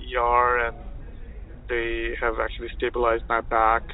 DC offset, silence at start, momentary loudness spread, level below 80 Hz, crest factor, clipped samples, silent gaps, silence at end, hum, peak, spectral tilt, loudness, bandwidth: under 0.1%; 0 s; 22 LU; -36 dBFS; 18 dB; under 0.1%; none; 0 s; none; -6 dBFS; -9.5 dB/octave; -24 LUFS; 4.1 kHz